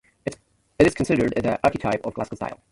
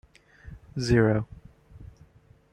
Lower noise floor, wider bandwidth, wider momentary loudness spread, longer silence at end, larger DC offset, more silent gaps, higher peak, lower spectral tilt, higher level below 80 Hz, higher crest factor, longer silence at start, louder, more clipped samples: second, -47 dBFS vs -57 dBFS; about the same, 11.5 kHz vs 10.5 kHz; second, 14 LU vs 26 LU; second, 0.2 s vs 0.65 s; neither; neither; first, -2 dBFS vs -8 dBFS; about the same, -6.5 dB/octave vs -7 dB/octave; about the same, -46 dBFS vs -48 dBFS; about the same, 20 dB vs 22 dB; second, 0.25 s vs 0.45 s; about the same, -23 LUFS vs -25 LUFS; neither